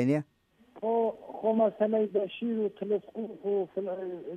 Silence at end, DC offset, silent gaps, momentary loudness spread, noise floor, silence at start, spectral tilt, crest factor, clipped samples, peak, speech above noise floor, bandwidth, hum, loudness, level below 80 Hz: 0 s; under 0.1%; none; 10 LU; -57 dBFS; 0 s; -8.5 dB/octave; 16 dB; under 0.1%; -14 dBFS; 27 dB; 9 kHz; none; -31 LUFS; -78 dBFS